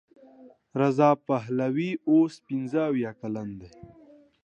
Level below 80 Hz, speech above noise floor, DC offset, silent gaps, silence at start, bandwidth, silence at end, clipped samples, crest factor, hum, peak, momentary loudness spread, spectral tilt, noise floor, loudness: -66 dBFS; 27 dB; under 0.1%; none; 0.4 s; 8.6 kHz; 0.6 s; under 0.1%; 20 dB; none; -8 dBFS; 13 LU; -8 dB/octave; -53 dBFS; -26 LUFS